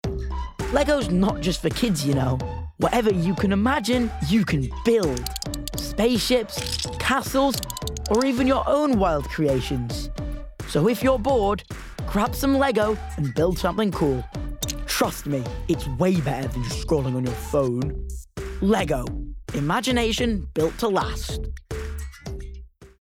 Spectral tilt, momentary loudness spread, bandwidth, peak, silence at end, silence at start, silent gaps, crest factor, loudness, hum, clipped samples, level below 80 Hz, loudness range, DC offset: -5.5 dB/octave; 12 LU; 18 kHz; -8 dBFS; 0.15 s; 0.05 s; none; 14 dB; -24 LUFS; none; under 0.1%; -34 dBFS; 3 LU; under 0.1%